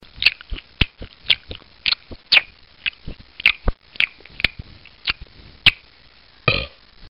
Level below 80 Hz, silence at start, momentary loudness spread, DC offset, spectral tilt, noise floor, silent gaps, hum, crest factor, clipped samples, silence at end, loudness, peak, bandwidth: -36 dBFS; 0.2 s; 21 LU; 0.2%; -4 dB/octave; -51 dBFS; none; none; 24 dB; under 0.1%; 0.05 s; -20 LUFS; 0 dBFS; 16 kHz